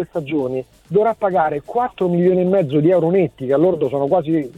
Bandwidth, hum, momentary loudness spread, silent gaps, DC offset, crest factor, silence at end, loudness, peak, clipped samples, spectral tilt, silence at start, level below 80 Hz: 7.2 kHz; none; 7 LU; none; under 0.1%; 14 dB; 0.1 s; -18 LUFS; -4 dBFS; under 0.1%; -9.5 dB/octave; 0 s; -54 dBFS